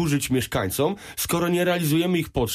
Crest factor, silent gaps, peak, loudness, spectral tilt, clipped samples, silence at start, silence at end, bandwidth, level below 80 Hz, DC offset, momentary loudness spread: 12 dB; none; -10 dBFS; -23 LUFS; -5 dB/octave; under 0.1%; 0 s; 0 s; 15.5 kHz; -46 dBFS; under 0.1%; 4 LU